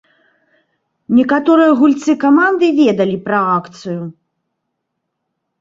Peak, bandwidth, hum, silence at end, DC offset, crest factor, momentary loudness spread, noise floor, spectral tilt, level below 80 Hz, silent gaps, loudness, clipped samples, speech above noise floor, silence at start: -2 dBFS; 7.6 kHz; none; 1.5 s; under 0.1%; 14 dB; 14 LU; -74 dBFS; -6.5 dB/octave; -60 dBFS; none; -12 LUFS; under 0.1%; 61 dB; 1.1 s